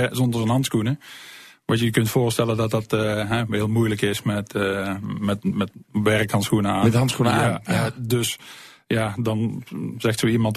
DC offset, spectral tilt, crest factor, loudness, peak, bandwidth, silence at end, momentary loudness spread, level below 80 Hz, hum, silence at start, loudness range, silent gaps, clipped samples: under 0.1%; -5.5 dB/octave; 16 dB; -22 LUFS; -6 dBFS; 14 kHz; 0 s; 8 LU; -52 dBFS; none; 0 s; 2 LU; none; under 0.1%